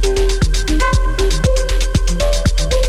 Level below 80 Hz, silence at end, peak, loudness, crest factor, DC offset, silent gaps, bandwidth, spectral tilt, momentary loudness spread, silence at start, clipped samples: -16 dBFS; 0 s; -2 dBFS; -17 LUFS; 10 dB; under 0.1%; none; 13 kHz; -4.5 dB/octave; 2 LU; 0 s; under 0.1%